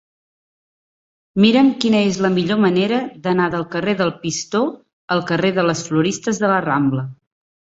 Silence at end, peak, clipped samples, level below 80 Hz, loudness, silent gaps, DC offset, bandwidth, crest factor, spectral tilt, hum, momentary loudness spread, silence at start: 0.5 s; -2 dBFS; under 0.1%; -56 dBFS; -18 LUFS; 4.93-5.08 s; under 0.1%; 8 kHz; 16 dB; -5.5 dB/octave; none; 7 LU; 1.35 s